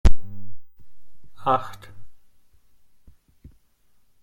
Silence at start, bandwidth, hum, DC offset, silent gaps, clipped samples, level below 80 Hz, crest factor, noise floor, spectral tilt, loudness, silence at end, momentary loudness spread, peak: 0.05 s; 7.6 kHz; none; under 0.1%; none; under 0.1%; -30 dBFS; 18 dB; -63 dBFS; -6.5 dB/octave; -26 LUFS; 2.05 s; 25 LU; -2 dBFS